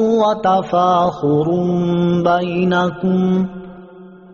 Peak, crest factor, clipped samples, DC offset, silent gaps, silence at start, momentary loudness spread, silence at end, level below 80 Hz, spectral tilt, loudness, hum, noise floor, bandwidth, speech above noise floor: -4 dBFS; 12 dB; under 0.1%; under 0.1%; none; 0 s; 4 LU; 0.15 s; -50 dBFS; -6.5 dB/octave; -16 LUFS; none; -39 dBFS; 7 kHz; 24 dB